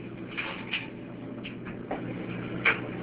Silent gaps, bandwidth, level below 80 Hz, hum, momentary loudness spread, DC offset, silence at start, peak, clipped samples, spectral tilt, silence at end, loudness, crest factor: none; 4 kHz; -58 dBFS; none; 14 LU; under 0.1%; 0 s; -10 dBFS; under 0.1%; -3 dB/octave; 0 s; -32 LUFS; 24 dB